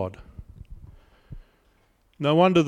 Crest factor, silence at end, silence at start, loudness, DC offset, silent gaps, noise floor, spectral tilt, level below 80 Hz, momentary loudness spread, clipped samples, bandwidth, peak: 20 dB; 0 s; 0 s; -22 LUFS; under 0.1%; none; -63 dBFS; -7 dB/octave; -48 dBFS; 28 LU; under 0.1%; 10.5 kHz; -6 dBFS